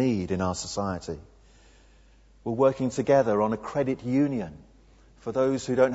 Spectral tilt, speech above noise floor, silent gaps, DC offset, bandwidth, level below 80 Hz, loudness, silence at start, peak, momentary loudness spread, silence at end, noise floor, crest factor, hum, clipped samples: -6 dB/octave; 31 dB; none; under 0.1%; 8 kHz; -54 dBFS; -26 LUFS; 0 s; -8 dBFS; 15 LU; 0 s; -56 dBFS; 18 dB; none; under 0.1%